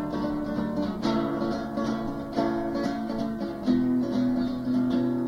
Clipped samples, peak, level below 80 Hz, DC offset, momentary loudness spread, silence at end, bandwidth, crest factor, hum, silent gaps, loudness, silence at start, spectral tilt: under 0.1%; -12 dBFS; -48 dBFS; under 0.1%; 5 LU; 0 s; 11 kHz; 16 dB; none; none; -28 LUFS; 0 s; -7.5 dB/octave